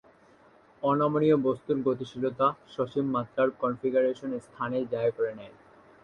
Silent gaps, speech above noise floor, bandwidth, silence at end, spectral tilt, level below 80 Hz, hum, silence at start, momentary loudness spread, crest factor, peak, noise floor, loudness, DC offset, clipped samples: none; 31 dB; 9.2 kHz; 0.55 s; -8 dB/octave; -68 dBFS; none; 0.8 s; 9 LU; 16 dB; -12 dBFS; -58 dBFS; -28 LUFS; under 0.1%; under 0.1%